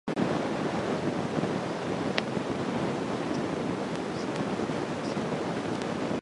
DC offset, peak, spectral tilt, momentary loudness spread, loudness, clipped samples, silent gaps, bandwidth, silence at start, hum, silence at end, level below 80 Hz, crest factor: under 0.1%; -4 dBFS; -6 dB/octave; 2 LU; -31 LUFS; under 0.1%; none; 11.5 kHz; 0.05 s; none; 0 s; -58 dBFS; 26 dB